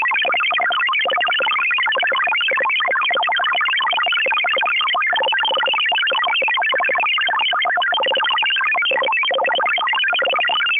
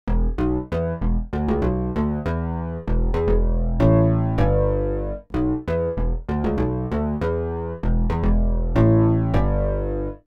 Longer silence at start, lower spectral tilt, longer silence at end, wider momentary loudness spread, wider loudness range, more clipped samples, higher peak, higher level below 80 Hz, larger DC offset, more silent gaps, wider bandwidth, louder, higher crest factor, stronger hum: about the same, 0 s vs 0.05 s; second, -4 dB/octave vs -10.5 dB/octave; about the same, 0 s vs 0.1 s; second, 1 LU vs 8 LU; second, 0 LU vs 3 LU; neither; second, -10 dBFS vs -6 dBFS; second, -76 dBFS vs -24 dBFS; neither; neither; second, 3.8 kHz vs 5 kHz; first, -16 LUFS vs -22 LUFS; second, 8 dB vs 14 dB; neither